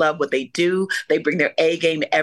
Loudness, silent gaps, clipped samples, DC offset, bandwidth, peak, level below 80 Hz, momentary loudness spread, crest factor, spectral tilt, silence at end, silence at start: -20 LUFS; none; under 0.1%; under 0.1%; 12.5 kHz; -4 dBFS; -72 dBFS; 4 LU; 14 dB; -4.5 dB/octave; 0 s; 0 s